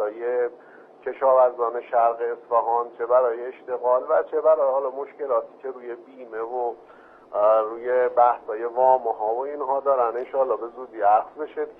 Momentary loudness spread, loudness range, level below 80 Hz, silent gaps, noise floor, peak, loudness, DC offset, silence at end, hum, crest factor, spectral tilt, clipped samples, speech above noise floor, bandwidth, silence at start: 14 LU; 4 LU; -74 dBFS; none; -48 dBFS; -6 dBFS; -23 LUFS; under 0.1%; 0.05 s; none; 18 dB; -8 dB/octave; under 0.1%; 26 dB; 3.7 kHz; 0 s